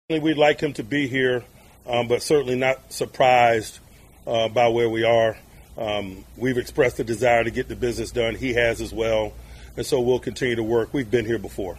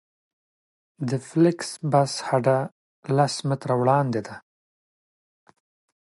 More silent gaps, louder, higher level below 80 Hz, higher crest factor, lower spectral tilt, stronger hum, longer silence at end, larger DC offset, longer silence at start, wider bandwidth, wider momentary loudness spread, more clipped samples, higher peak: second, none vs 2.72-3.03 s; about the same, -22 LUFS vs -23 LUFS; first, -44 dBFS vs -70 dBFS; about the same, 18 dB vs 18 dB; about the same, -5 dB/octave vs -6 dB/octave; neither; second, 0 s vs 1.6 s; neither; second, 0.1 s vs 1 s; first, 15.5 kHz vs 11.5 kHz; second, 10 LU vs 13 LU; neither; about the same, -4 dBFS vs -6 dBFS